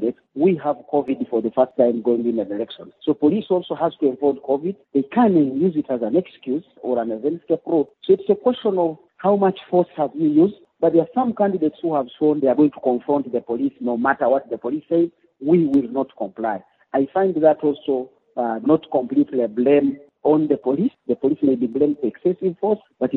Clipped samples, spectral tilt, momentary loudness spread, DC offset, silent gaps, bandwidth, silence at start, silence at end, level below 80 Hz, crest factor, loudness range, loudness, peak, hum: under 0.1%; -7 dB/octave; 8 LU; under 0.1%; none; 4.2 kHz; 0 s; 0 s; -66 dBFS; 18 dB; 2 LU; -20 LUFS; -2 dBFS; none